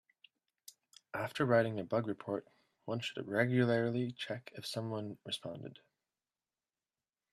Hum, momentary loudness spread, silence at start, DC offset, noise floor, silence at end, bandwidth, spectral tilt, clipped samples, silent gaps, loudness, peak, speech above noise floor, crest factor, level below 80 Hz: none; 15 LU; 1.15 s; under 0.1%; under -90 dBFS; 1.6 s; 14 kHz; -6 dB/octave; under 0.1%; none; -36 LUFS; -16 dBFS; over 54 dB; 22 dB; -78 dBFS